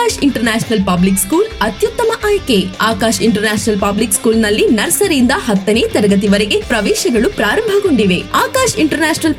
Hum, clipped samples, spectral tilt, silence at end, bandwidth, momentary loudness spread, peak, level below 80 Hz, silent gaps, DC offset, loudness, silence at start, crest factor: none; under 0.1%; -4 dB/octave; 0 s; 17 kHz; 3 LU; 0 dBFS; -34 dBFS; none; under 0.1%; -13 LUFS; 0 s; 12 dB